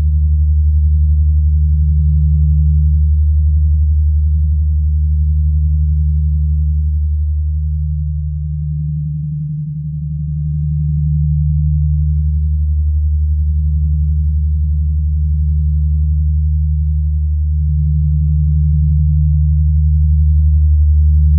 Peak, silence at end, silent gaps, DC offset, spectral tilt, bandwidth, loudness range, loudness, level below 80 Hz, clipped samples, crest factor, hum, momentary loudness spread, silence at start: -4 dBFS; 0 s; none; under 0.1%; -30 dB/octave; 0.3 kHz; 5 LU; -15 LUFS; -14 dBFS; under 0.1%; 8 dB; none; 7 LU; 0 s